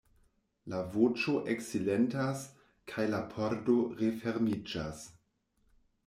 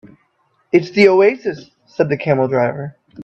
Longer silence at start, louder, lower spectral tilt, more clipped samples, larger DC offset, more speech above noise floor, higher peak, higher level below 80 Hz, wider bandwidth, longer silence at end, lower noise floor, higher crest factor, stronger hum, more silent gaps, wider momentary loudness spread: about the same, 0.65 s vs 0.75 s; second, -33 LUFS vs -15 LUFS; about the same, -6 dB/octave vs -7 dB/octave; neither; neither; second, 42 dB vs 48 dB; second, -14 dBFS vs 0 dBFS; second, -66 dBFS vs -60 dBFS; first, 15 kHz vs 8 kHz; first, 0.95 s vs 0 s; first, -75 dBFS vs -62 dBFS; about the same, 18 dB vs 16 dB; neither; neither; second, 15 LU vs 20 LU